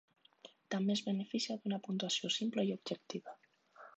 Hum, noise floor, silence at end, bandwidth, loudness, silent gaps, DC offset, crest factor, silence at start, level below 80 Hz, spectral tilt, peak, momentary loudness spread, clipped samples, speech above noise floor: none; -62 dBFS; 0.1 s; 8.4 kHz; -38 LUFS; none; under 0.1%; 16 dB; 0.45 s; -88 dBFS; -4.5 dB/octave; -24 dBFS; 20 LU; under 0.1%; 24 dB